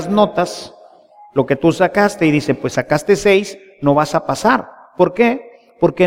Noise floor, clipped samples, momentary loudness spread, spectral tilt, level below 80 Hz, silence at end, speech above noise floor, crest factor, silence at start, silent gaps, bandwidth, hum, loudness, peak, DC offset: -44 dBFS; under 0.1%; 9 LU; -5.5 dB/octave; -48 dBFS; 0 s; 29 dB; 16 dB; 0 s; none; 16 kHz; none; -16 LUFS; 0 dBFS; under 0.1%